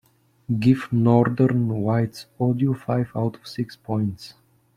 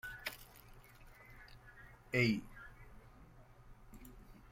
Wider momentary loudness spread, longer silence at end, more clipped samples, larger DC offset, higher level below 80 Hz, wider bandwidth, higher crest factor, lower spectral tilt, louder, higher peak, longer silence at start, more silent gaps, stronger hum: second, 13 LU vs 28 LU; first, 0.45 s vs 0 s; neither; neither; about the same, -58 dBFS vs -60 dBFS; second, 12.5 kHz vs 16.5 kHz; second, 18 dB vs 26 dB; first, -8.5 dB/octave vs -5.5 dB/octave; first, -23 LUFS vs -37 LUFS; first, -4 dBFS vs -18 dBFS; first, 0.5 s vs 0.05 s; neither; neither